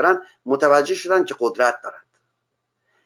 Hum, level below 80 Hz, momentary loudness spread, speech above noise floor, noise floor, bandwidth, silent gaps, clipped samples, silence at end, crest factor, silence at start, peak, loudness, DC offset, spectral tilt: none; -74 dBFS; 10 LU; 57 dB; -76 dBFS; 18 kHz; none; under 0.1%; 1.05 s; 18 dB; 0 s; -2 dBFS; -19 LUFS; under 0.1%; -3.5 dB/octave